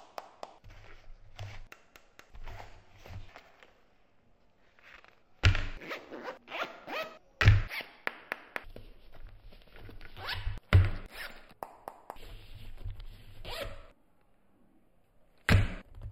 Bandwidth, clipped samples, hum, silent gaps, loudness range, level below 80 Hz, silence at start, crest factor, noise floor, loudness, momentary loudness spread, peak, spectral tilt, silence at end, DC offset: 15.5 kHz; under 0.1%; none; none; 19 LU; -40 dBFS; 0.2 s; 28 dB; -69 dBFS; -33 LUFS; 27 LU; -6 dBFS; -6 dB/octave; 0 s; under 0.1%